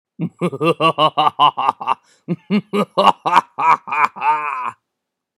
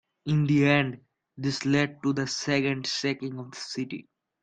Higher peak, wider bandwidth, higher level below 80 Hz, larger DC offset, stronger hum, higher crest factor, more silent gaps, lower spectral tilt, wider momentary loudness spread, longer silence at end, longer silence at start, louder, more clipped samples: first, 0 dBFS vs -6 dBFS; first, 15 kHz vs 9.2 kHz; about the same, -66 dBFS vs -64 dBFS; neither; neither; about the same, 18 dB vs 22 dB; neither; about the same, -5.5 dB/octave vs -5.5 dB/octave; second, 11 LU vs 14 LU; first, 0.65 s vs 0.4 s; about the same, 0.2 s vs 0.25 s; first, -17 LUFS vs -27 LUFS; neither